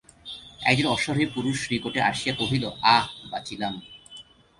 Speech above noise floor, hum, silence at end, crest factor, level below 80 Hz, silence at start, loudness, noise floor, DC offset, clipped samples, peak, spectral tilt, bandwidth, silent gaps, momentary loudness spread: 23 dB; none; 0.35 s; 22 dB; -56 dBFS; 0.25 s; -24 LUFS; -48 dBFS; under 0.1%; under 0.1%; -4 dBFS; -4.5 dB/octave; 11.5 kHz; none; 19 LU